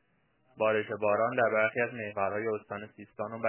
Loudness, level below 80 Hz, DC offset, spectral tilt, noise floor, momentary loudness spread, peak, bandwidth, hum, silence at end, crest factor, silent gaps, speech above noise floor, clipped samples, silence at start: -30 LUFS; -70 dBFS; under 0.1%; -4 dB/octave; -72 dBFS; 14 LU; -14 dBFS; 3.2 kHz; none; 0 s; 18 dB; none; 41 dB; under 0.1%; 0.55 s